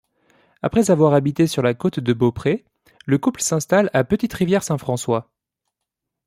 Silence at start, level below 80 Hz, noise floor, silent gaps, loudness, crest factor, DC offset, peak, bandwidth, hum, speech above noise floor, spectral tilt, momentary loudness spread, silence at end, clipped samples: 0.65 s; -52 dBFS; -82 dBFS; none; -19 LUFS; 18 dB; under 0.1%; -2 dBFS; 16 kHz; none; 63 dB; -6 dB/octave; 8 LU; 1.05 s; under 0.1%